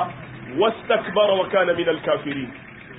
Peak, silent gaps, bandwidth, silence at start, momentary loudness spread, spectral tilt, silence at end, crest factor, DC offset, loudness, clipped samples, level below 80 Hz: -6 dBFS; none; 4 kHz; 0 s; 14 LU; -10 dB/octave; 0 s; 16 dB; under 0.1%; -21 LUFS; under 0.1%; -56 dBFS